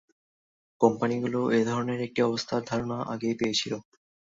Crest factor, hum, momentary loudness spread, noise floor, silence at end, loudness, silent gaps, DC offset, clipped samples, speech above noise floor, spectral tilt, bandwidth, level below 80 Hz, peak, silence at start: 22 dB; none; 6 LU; under -90 dBFS; 0.5 s; -28 LUFS; none; under 0.1%; under 0.1%; over 63 dB; -5 dB/octave; 7.8 kHz; -64 dBFS; -6 dBFS; 0.8 s